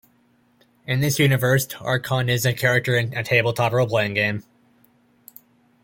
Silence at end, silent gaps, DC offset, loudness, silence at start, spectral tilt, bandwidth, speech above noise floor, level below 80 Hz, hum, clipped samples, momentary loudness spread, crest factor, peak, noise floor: 1.45 s; none; under 0.1%; -21 LUFS; 0.85 s; -5 dB/octave; 17 kHz; 40 dB; -58 dBFS; none; under 0.1%; 6 LU; 20 dB; -4 dBFS; -61 dBFS